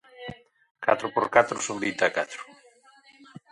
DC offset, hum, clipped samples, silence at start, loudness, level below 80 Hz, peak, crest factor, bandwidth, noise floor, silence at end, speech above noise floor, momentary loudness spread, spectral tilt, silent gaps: under 0.1%; none; under 0.1%; 0.2 s; -25 LUFS; -66 dBFS; -2 dBFS; 26 dB; 11.5 kHz; -57 dBFS; 0.15 s; 32 dB; 20 LU; -3 dB/octave; 0.71-0.75 s